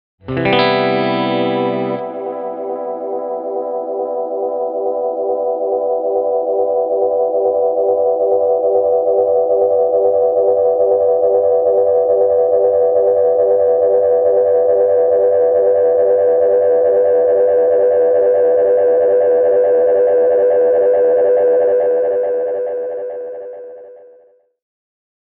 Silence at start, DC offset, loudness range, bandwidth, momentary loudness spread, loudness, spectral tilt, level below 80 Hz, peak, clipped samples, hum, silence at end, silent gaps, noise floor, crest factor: 0.25 s; under 0.1%; 8 LU; 4.9 kHz; 9 LU; -14 LUFS; -4 dB/octave; -58 dBFS; 0 dBFS; under 0.1%; none; 1.35 s; none; -50 dBFS; 14 dB